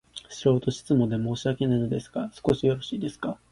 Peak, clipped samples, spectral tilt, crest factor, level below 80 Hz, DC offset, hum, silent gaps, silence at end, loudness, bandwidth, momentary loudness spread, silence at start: -8 dBFS; under 0.1%; -7 dB/octave; 18 dB; -54 dBFS; under 0.1%; none; none; 0.15 s; -27 LUFS; 11.5 kHz; 8 LU; 0.15 s